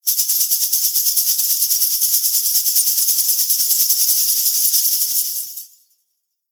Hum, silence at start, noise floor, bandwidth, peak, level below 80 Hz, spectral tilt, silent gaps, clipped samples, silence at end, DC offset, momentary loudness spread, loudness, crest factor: none; 0.05 s; -72 dBFS; over 20 kHz; -2 dBFS; under -90 dBFS; 9.5 dB/octave; none; under 0.1%; 0.85 s; under 0.1%; 3 LU; -14 LUFS; 16 dB